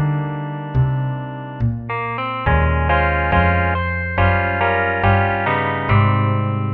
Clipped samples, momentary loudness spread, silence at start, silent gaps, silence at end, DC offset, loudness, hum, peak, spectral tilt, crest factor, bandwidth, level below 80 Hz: under 0.1%; 8 LU; 0 s; none; 0 s; under 0.1%; -18 LUFS; none; -2 dBFS; -10.5 dB/octave; 14 dB; 4.4 kHz; -28 dBFS